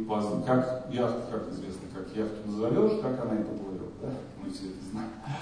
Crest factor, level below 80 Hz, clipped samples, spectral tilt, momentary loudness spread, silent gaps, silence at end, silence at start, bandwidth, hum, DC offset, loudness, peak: 18 dB; -56 dBFS; under 0.1%; -7.5 dB/octave; 12 LU; none; 0 s; 0 s; 10 kHz; none; under 0.1%; -32 LUFS; -12 dBFS